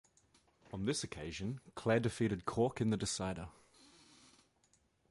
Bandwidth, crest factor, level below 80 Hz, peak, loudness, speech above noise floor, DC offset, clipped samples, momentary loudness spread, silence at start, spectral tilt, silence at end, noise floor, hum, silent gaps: 11.5 kHz; 20 dB; -62 dBFS; -20 dBFS; -38 LUFS; 37 dB; under 0.1%; under 0.1%; 10 LU; 0.7 s; -5 dB/octave; 1.6 s; -74 dBFS; none; none